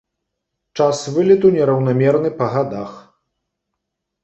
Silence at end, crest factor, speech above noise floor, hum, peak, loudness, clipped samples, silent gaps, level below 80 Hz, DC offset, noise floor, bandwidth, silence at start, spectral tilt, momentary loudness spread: 1.25 s; 16 dB; 62 dB; none; -2 dBFS; -16 LUFS; under 0.1%; none; -58 dBFS; under 0.1%; -78 dBFS; 8.2 kHz; 0.75 s; -7 dB/octave; 15 LU